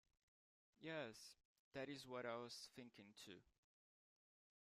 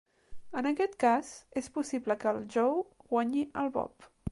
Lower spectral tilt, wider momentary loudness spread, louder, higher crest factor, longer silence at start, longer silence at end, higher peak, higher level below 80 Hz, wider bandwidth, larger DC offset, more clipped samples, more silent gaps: second, -4 dB/octave vs -5.5 dB/octave; about the same, 11 LU vs 11 LU; second, -55 LUFS vs -32 LUFS; about the same, 20 dB vs 16 dB; first, 0.8 s vs 0.3 s; first, 1.25 s vs 0 s; second, -38 dBFS vs -16 dBFS; second, under -90 dBFS vs -64 dBFS; first, 15 kHz vs 11.5 kHz; neither; neither; first, 1.45-1.72 s vs none